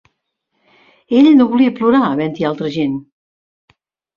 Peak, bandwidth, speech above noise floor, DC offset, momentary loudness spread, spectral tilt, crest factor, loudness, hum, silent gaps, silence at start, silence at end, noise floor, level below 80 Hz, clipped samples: -2 dBFS; 6.8 kHz; 58 dB; under 0.1%; 10 LU; -7.5 dB/octave; 14 dB; -14 LUFS; none; none; 1.1 s; 1.15 s; -71 dBFS; -58 dBFS; under 0.1%